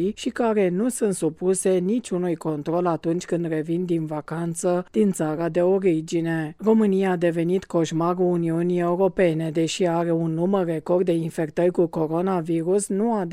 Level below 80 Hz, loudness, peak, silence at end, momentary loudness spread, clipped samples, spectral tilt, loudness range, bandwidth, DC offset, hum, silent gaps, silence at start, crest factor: -58 dBFS; -23 LUFS; -8 dBFS; 0 s; 5 LU; under 0.1%; -6.5 dB/octave; 3 LU; 15 kHz; under 0.1%; none; none; 0 s; 14 dB